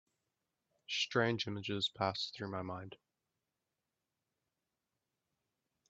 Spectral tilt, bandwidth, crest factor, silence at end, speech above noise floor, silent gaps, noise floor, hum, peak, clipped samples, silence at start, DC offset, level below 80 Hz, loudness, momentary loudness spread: -2.5 dB/octave; 8 kHz; 24 dB; 2.95 s; 51 dB; none; -89 dBFS; none; -18 dBFS; under 0.1%; 0.9 s; under 0.1%; -80 dBFS; -37 LUFS; 12 LU